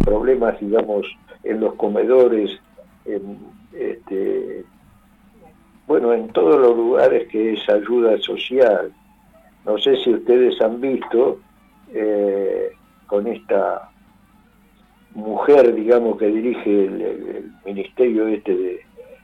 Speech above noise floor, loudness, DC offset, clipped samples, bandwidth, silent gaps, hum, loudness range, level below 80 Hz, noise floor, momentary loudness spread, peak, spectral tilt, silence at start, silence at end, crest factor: 36 dB; -18 LUFS; under 0.1%; under 0.1%; 5.4 kHz; none; none; 7 LU; -42 dBFS; -53 dBFS; 17 LU; -2 dBFS; -7.5 dB/octave; 0 s; 0.2 s; 16 dB